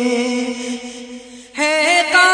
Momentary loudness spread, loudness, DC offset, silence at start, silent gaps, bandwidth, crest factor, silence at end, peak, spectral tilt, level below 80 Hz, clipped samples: 21 LU; -16 LUFS; under 0.1%; 0 s; none; 10 kHz; 16 dB; 0 s; 0 dBFS; -1 dB/octave; -62 dBFS; under 0.1%